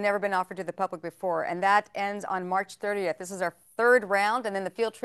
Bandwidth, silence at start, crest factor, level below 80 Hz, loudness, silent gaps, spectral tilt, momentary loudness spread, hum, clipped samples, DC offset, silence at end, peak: 12.5 kHz; 0 s; 18 dB; -78 dBFS; -28 LUFS; none; -4.5 dB/octave; 10 LU; none; under 0.1%; under 0.1%; 0.05 s; -8 dBFS